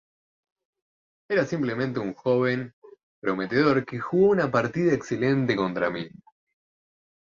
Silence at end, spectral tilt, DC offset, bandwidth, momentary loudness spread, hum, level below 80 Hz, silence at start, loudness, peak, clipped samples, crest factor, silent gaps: 1.2 s; -7 dB/octave; under 0.1%; 7.4 kHz; 9 LU; none; -62 dBFS; 1.3 s; -25 LUFS; -8 dBFS; under 0.1%; 18 dB; 2.73-2.82 s, 3.03-3.22 s